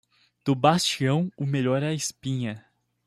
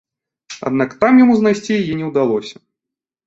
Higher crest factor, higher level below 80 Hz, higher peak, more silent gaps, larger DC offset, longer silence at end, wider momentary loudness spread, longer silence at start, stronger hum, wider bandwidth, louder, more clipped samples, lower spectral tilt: first, 22 dB vs 14 dB; second, -64 dBFS vs -56 dBFS; about the same, -4 dBFS vs -2 dBFS; neither; neither; second, 0.5 s vs 0.75 s; second, 11 LU vs 15 LU; about the same, 0.45 s vs 0.5 s; neither; first, 14.5 kHz vs 7.8 kHz; second, -25 LUFS vs -15 LUFS; neither; second, -5 dB/octave vs -6.5 dB/octave